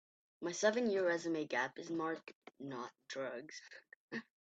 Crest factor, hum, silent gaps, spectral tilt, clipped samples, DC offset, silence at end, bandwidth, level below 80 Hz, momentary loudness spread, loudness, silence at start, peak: 22 dB; none; 2.35-2.42 s, 3.96-4.08 s; -3.5 dB/octave; under 0.1%; under 0.1%; 0.25 s; 8.4 kHz; -88 dBFS; 17 LU; -39 LUFS; 0.4 s; -20 dBFS